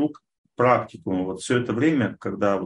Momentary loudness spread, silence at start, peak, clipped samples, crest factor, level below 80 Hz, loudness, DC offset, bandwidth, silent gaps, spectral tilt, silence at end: 7 LU; 0 s; -4 dBFS; under 0.1%; 18 dB; -60 dBFS; -23 LUFS; under 0.1%; 11.5 kHz; 0.38-0.44 s; -6.5 dB/octave; 0 s